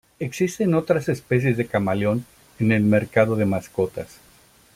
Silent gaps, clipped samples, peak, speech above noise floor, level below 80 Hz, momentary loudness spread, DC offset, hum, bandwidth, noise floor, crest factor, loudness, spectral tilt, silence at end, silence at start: none; under 0.1%; -4 dBFS; 33 dB; -56 dBFS; 8 LU; under 0.1%; none; 16 kHz; -54 dBFS; 18 dB; -22 LUFS; -7 dB/octave; 0.7 s; 0.2 s